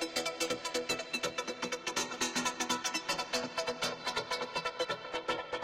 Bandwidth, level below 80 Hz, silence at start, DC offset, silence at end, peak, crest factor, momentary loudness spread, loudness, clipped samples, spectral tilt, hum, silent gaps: 16.5 kHz; -68 dBFS; 0 s; under 0.1%; 0 s; -20 dBFS; 18 dB; 4 LU; -35 LUFS; under 0.1%; -1.5 dB/octave; none; none